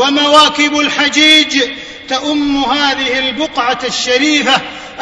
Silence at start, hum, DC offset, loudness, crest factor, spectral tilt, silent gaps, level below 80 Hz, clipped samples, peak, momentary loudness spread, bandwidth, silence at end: 0 s; none; under 0.1%; -10 LUFS; 12 dB; -1.5 dB/octave; none; -46 dBFS; 0.6%; 0 dBFS; 10 LU; 11 kHz; 0 s